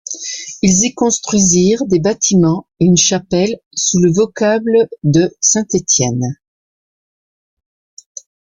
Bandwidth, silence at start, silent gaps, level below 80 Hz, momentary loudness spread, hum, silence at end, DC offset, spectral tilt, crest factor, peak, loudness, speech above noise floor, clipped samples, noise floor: 10 kHz; 0.1 s; 3.66-3.71 s; -46 dBFS; 11 LU; none; 2.25 s; under 0.1%; -4.5 dB/octave; 14 dB; 0 dBFS; -13 LUFS; over 77 dB; under 0.1%; under -90 dBFS